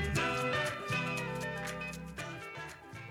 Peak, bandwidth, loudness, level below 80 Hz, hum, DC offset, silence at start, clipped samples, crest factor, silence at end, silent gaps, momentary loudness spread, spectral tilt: -22 dBFS; 18.5 kHz; -36 LUFS; -52 dBFS; none; under 0.1%; 0 s; under 0.1%; 16 dB; 0 s; none; 12 LU; -4.5 dB/octave